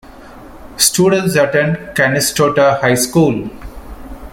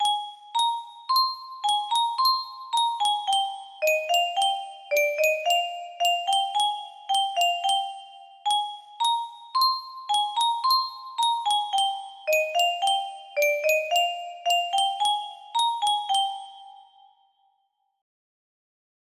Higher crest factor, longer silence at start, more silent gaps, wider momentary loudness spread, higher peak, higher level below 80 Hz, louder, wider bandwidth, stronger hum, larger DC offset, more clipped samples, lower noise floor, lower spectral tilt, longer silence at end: about the same, 14 dB vs 16 dB; about the same, 0.1 s vs 0 s; neither; first, 22 LU vs 8 LU; first, 0 dBFS vs -10 dBFS; first, -38 dBFS vs -80 dBFS; first, -13 LUFS vs -24 LUFS; about the same, 17 kHz vs 15.5 kHz; neither; neither; neither; second, -35 dBFS vs -73 dBFS; first, -4 dB/octave vs 3 dB/octave; second, 0.05 s vs 2.2 s